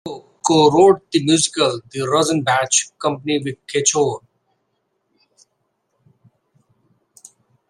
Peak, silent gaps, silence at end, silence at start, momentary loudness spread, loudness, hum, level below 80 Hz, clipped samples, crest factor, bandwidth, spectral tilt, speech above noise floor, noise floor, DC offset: -2 dBFS; none; 3.5 s; 0.05 s; 10 LU; -17 LUFS; none; -62 dBFS; under 0.1%; 18 dB; 12.5 kHz; -3.5 dB/octave; 54 dB; -70 dBFS; under 0.1%